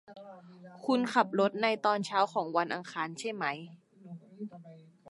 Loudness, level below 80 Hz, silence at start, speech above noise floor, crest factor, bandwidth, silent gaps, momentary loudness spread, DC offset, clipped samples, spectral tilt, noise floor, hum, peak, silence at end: -31 LUFS; -86 dBFS; 0.1 s; 19 dB; 22 dB; 11.5 kHz; none; 23 LU; under 0.1%; under 0.1%; -5 dB/octave; -50 dBFS; none; -10 dBFS; 0 s